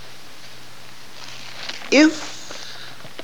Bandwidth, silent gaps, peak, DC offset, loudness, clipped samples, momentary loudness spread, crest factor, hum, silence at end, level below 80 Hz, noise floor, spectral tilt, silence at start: 18 kHz; none; -2 dBFS; 2%; -19 LUFS; under 0.1%; 25 LU; 22 dB; none; 0 s; -66 dBFS; -43 dBFS; -3 dB/octave; 1.2 s